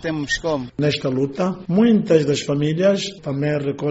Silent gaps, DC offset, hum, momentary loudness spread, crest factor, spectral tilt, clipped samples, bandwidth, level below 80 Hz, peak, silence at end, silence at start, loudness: none; under 0.1%; none; 8 LU; 16 dB; -5.5 dB/octave; under 0.1%; 8 kHz; -50 dBFS; -2 dBFS; 0 s; 0 s; -20 LUFS